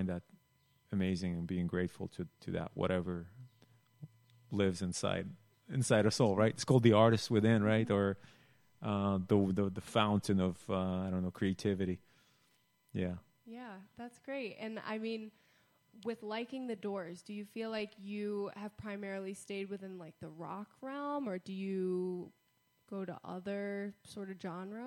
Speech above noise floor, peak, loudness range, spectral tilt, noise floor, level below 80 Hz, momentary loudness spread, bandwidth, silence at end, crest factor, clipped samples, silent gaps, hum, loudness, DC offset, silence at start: 39 dB; -12 dBFS; 13 LU; -6 dB/octave; -74 dBFS; -68 dBFS; 17 LU; 16 kHz; 0 s; 24 dB; under 0.1%; none; none; -36 LUFS; under 0.1%; 0 s